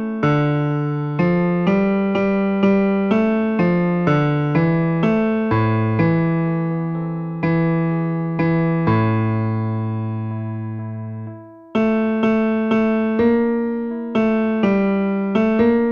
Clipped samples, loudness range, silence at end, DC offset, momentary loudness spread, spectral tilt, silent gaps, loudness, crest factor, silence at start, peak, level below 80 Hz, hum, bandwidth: under 0.1%; 4 LU; 0 s; under 0.1%; 8 LU; -10 dB/octave; none; -19 LUFS; 14 dB; 0 s; -4 dBFS; -48 dBFS; none; 6.4 kHz